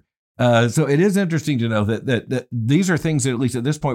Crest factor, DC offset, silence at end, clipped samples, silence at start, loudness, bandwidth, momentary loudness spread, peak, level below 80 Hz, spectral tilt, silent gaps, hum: 14 dB; under 0.1%; 0 s; under 0.1%; 0.4 s; -19 LUFS; 16 kHz; 5 LU; -6 dBFS; -52 dBFS; -6 dB/octave; none; none